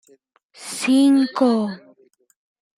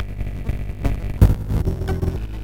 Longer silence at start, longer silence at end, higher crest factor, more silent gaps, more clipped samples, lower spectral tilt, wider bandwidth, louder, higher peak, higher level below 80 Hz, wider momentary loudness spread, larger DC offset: first, 0.6 s vs 0 s; first, 1 s vs 0 s; about the same, 16 dB vs 18 dB; neither; neither; second, -4.5 dB/octave vs -8 dB/octave; about the same, 15 kHz vs 16.5 kHz; first, -18 LUFS vs -23 LUFS; about the same, -4 dBFS vs -2 dBFS; second, -74 dBFS vs -24 dBFS; first, 20 LU vs 11 LU; neither